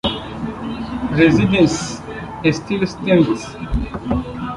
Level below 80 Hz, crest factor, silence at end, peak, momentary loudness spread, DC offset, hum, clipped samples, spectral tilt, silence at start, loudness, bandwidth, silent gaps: -34 dBFS; 16 dB; 0 s; -2 dBFS; 13 LU; under 0.1%; none; under 0.1%; -6 dB/octave; 0.05 s; -18 LUFS; 11.5 kHz; none